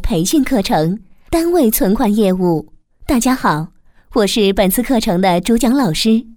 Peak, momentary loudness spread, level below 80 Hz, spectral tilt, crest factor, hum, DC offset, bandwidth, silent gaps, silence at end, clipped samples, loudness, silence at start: -2 dBFS; 7 LU; -32 dBFS; -5 dB/octave; 14 dB; none; under 0.1%; over 20 kHz; none; 0 s; under 0.1%; -15 LUFS; 0 s